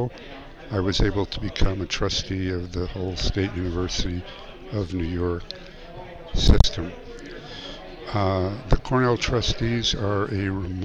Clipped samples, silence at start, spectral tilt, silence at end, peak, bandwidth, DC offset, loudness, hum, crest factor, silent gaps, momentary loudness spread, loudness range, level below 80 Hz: under 0.1%; 0 s; -5.5 dB/octave; 0 s; 0 dBFS; 8 kHz; under 0.1%; -25 LUFS; none; 24 dB; none; 17 LU; 4 LU; -30 dBFS